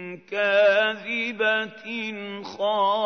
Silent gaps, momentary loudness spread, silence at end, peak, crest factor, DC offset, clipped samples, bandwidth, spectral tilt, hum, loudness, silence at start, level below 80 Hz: none; 13 LU; 0 s; -8 dBFS; 16 dB; under 0.1%; under 0.1%; 6.6 kHz; -4 dB/octave; none; -23 LUFS; 0 s; -82 dBFS